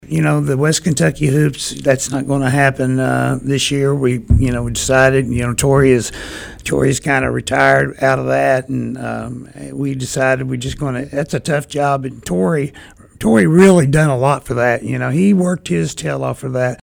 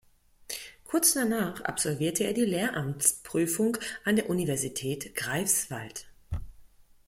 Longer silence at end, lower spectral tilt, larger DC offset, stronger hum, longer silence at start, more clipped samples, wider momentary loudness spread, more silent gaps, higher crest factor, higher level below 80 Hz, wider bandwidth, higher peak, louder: second, 0.05 s vs 0.4 s; first, -5.5 dB/octave vs -3.5 dB/octave; neither; neither; second, 0.05 s vs 0.5 s; neither; second, 10 LU vs 15 LU; neither; second, 14 dB vs 22 dB; first, -32 dBFS vs -52 dBFS; first, 19 kHz vs 16.5 kHz; first, 0 dBFS vs -8 dBFS; first, -15 LUFS vs -28 LUFS